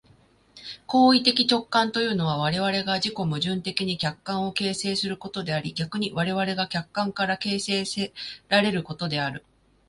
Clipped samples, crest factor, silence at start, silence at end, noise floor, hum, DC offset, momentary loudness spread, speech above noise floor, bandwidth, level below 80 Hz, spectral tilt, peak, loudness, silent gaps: under 0.1%; 22 dB; 0.55 s; 0.5 s; -58 dBFS; none; under 0.1%; 10 LU; 33 dB; 11.5 kHz; -60 dBFS; -4.5 dB/octave; -4 dBFS; -25 LUFS; none